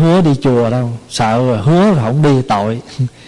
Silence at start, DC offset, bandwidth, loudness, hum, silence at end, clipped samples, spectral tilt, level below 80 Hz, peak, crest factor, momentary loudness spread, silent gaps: 0 s; under 0.1%; 11.5 kHz; -13 LUFS; none; 0.2 s; under 0.1%; -7 dB/octave; -42 dBFS; -4 dBFS; 8 dB; 9 LU; none